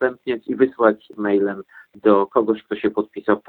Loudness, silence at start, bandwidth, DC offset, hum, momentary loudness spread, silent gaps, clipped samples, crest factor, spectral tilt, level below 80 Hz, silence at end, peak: -20 LUFS; 0 s; 4.3 kHz; under 0.1%; none; 9 LU; none; under 0.1%; 18 dB; -9.5 dB/octave; -62 dBFS; 0.1 s; -2 dBFS